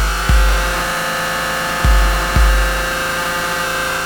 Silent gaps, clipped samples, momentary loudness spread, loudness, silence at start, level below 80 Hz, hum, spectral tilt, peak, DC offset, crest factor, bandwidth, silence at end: none; under 0.1%; 3 LU; -16 LUFS; 0 s; -18 dBFS; none; -3.5 dB/octave; 0 dBFS; under 0.1%; 16 dB; over 20 kHz; 0 s